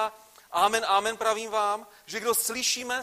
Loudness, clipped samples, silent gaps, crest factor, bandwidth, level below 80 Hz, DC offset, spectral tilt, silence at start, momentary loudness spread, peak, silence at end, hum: -26 LUFS; under 0.1%; none; 20 dB; 15.5 kHz; -68 dBFS; under 0.1%; 0 dB/octave; 0 s; 9 LU; -8 dBFS; 0 s; none